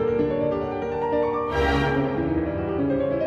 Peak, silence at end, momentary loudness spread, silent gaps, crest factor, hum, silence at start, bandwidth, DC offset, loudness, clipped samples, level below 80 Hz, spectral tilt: -10 dBFS; 0 s; 4 LU; none; 14 dB; none; 0 s; 8.4 kHz; under 0.1%; -24 LUFS; under 0.1%; -38 dBFS; -8 dB/octave